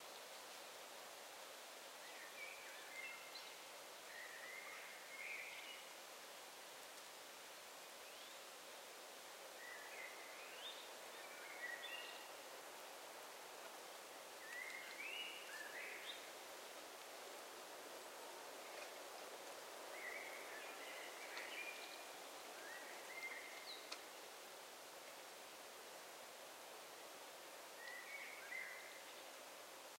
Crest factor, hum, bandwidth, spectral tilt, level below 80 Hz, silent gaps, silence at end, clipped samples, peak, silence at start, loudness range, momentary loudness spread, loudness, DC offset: 22 dB; none; 16 kHz; 0.5 dB/octave; under -90 dBFS; none; 0 s; under 0.1%; -32 dBFS; 0 s; 4 LU; 6 LU; -53 LUFS; under 0.1%